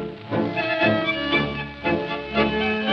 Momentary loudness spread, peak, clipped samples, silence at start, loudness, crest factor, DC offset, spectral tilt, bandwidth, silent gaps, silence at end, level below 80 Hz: 7 LU; -8 dBFS; under 0.1%; 0 s; -23 LUFS; 16 dB; under 0.1%; -7 dB/octave; 6.6 kHz; none; 0 s; -46 dBFS